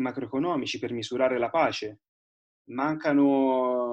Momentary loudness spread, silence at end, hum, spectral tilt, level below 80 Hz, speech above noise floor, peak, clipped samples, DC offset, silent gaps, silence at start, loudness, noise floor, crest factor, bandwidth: 9 LU; 0 s; none; -5.5 dB/octave; -68 dBFS; over 64 dB; -10 dBFS; under 0.1%; under 0.1%; 2.08-2.65 s; 0 s; -26 LUFS; under -90 dBFS; 16 dB; 8.4 kHz